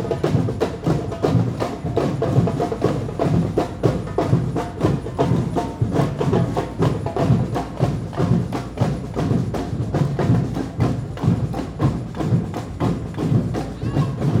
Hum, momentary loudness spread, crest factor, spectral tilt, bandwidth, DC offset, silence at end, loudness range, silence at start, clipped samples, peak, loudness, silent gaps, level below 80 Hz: none; 5 LU; 18 dB; -8 dB/octave; 13 kHz; under 0.1%; 0 s; 1 LU; 0 s; under 0.1%; -2 dBFS; -22 LUFS; none; -38 dBFS